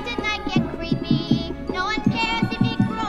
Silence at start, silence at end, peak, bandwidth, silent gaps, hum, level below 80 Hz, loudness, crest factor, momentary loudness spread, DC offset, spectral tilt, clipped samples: 0 s; 0 s; -6 dBFS; 11 kHz; none; none; -38 dBFS; -23 LUFS; 16 dB; 5 LU; under 0.1%; -6 dB/octave; under 0.1%